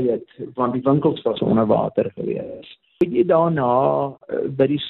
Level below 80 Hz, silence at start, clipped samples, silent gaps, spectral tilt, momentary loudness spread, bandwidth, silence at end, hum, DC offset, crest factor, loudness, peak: -56 dBFS; 0 s; under 0.1%; none; -10 dB/octave; 10 LU; 4.3 kHz; 0 s; none; under 0.1%; 16 dB; -20 LUFS; -4 dBFS